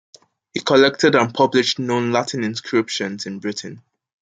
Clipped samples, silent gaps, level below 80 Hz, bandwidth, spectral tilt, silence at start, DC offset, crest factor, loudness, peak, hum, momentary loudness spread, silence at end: under 0.1%; none; -64 dBFS; 9.4 kHz; -4.5 dB/octave; 0.55 s; under 0.1%; 18 dB; -19 LUFS; -2 dBFS; none; 13 LU; 0.45 s